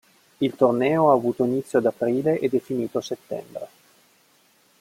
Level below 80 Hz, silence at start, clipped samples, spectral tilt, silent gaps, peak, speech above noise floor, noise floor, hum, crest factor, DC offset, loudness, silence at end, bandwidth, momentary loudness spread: -68 dBFS; 0.4 s; under 0.1%; -7 dB/octave; none; -4 dBFS; 38 dB; -60 dBFS; none; 20 dB; under 0.1%; -23 LUFS; 1.15 s; 16.5 kHz; 14 LU